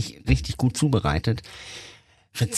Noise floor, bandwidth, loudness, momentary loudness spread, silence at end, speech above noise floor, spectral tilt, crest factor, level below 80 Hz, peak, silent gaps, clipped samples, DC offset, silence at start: -44 dBFS; 13.5 kHz; -24 LUFS; 17 LU; 0 s; 19 dB; -5.5 dB/octave; 18 dB; -34 dBFS; -6 dBFS; none; under 0.1%; under 0.1%; 0 s